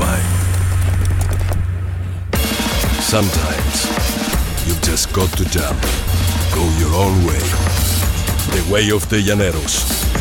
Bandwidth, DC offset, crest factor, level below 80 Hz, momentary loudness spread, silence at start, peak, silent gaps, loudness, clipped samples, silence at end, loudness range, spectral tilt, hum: 18 kHz; under 0.1%; 14 dB; -22 dBFS; 4 LU; 0 s; -2 dBFS; none; -17 LUFS; under 0.1%; 0 s; 2 LU; -4.5 dB/octave; none